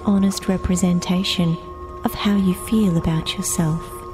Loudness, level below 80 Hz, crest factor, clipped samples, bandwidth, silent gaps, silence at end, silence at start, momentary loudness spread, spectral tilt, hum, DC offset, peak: -20 LUFS; -36 dBFS; 16 dB; under 0.1%; 16 kHz; none; 0 s; 0 s; 8 LU; -5.5 dB/octave; none; under 0.1%; -4 dBFS